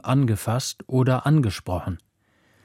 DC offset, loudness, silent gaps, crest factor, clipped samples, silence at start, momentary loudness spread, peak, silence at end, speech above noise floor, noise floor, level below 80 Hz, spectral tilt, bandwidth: under 0.1%; -23 LUFS; none; 14 dB; under 0.1%; 0.05 s; 10 LU; -8 dBFS; 0.65 s; 42 dB; -64 dBFS; -48 dBFS; -6.5 dB/octave; 16 kHz